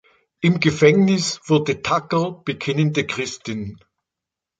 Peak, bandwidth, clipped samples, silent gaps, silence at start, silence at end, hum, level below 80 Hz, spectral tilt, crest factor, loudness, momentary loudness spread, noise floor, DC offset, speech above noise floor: -2 dBFS; 9.2 kHz; under 0.1%; none; 0.4 s; 0.85 s; none; -54 dBFS; -5.5 dB/octave; 20 dB; -20 LUFS; 13 LU; -86 dBFS; under 0.1%; 66 dB